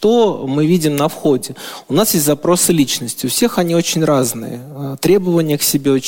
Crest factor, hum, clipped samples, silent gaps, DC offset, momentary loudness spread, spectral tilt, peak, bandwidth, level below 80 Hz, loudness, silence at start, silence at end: 14 dB; none; under 0.1%; none; under 0.1%; 9 LU; -4.5 dB/octave; -2 dBFS; 17 kHz; -50 dBFS; -15 LUFS; 0 s; 0 s